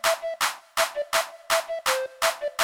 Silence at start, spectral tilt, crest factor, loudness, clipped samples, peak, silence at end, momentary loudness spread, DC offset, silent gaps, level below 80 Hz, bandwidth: 0.05 s; 1.5 dB/octave; 16 dB; -26 LUFS; under 0.1%; -10 dBFS; 0 s; 2 LU; under 0.1%; none; -62 dBFS; 20 kHz